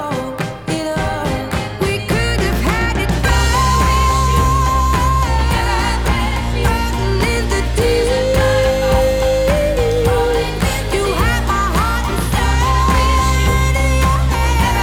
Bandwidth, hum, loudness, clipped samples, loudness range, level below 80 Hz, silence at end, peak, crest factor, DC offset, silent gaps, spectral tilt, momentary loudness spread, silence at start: 17.5 kHz; none; -16 LUFS; under 0.1%; 2 LU; -18 dBFS; 0 s; -2 dBFS; 12 dB; under 0.1%; none; -5 dB/octave; 5 LU; 0 s